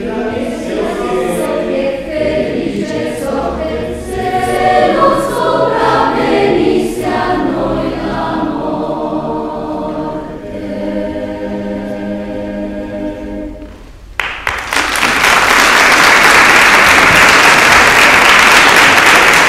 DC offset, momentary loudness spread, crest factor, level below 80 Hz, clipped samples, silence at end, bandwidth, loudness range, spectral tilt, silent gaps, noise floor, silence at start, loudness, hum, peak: under 0.1%; 16 LU; 12 dB; -34 dBFS; 0.5%; 0 s; over 20 kHz; 16 LU; -2.5 dB/octave; none; -32 dBFS; 0 s; -10 LUFS; none; 0 dBFS